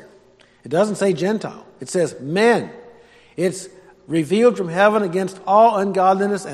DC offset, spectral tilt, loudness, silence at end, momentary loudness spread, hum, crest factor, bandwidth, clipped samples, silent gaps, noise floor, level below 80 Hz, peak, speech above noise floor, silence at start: under 0.1%; -5.5 dB/octave; -18 LUFS; 0 s; 16 LU; none; 18 dB; 13 kHz; under 0.1%; none; -52 dBFS; -64 dBFS; -2 dBFS; 34 dB; 0.65 s